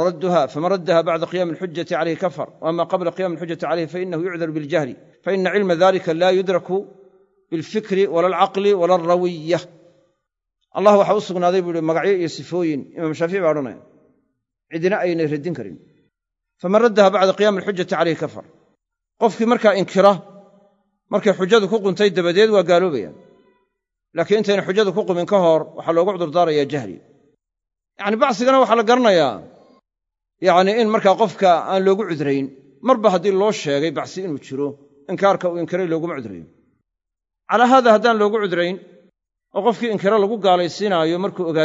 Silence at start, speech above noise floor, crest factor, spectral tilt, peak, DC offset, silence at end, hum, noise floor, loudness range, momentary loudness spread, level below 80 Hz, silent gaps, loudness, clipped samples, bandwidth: 0 s; 66 dB; 18 dB; -6 dB/octave; 0 dBFS; under 0.1%; 0 s; none; -84 dBFS; 5 LU; 12 LU; -70 dBFS; none; -18 LUFS; under 0.1%; 7.8 kHz